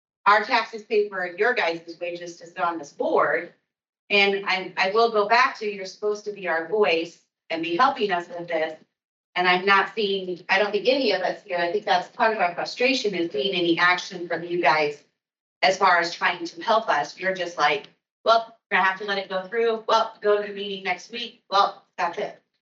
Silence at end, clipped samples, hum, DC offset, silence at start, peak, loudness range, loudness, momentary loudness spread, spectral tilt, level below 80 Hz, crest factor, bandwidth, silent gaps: 0.3 s; under 0.1%; none; under 0.1%; 0.25 s; -6 dBFS; 3 LU; -23 LUFS; 10 LU; -3.5 dB/octave; -86 dBFS; 18 dB; 7.8 kHz; 3.89-3.93 s, 3.99-4.08 s, 9.05-9.33 s, 15.40-15.61 s, 18.11-18.24 s, 18.66-18.70 s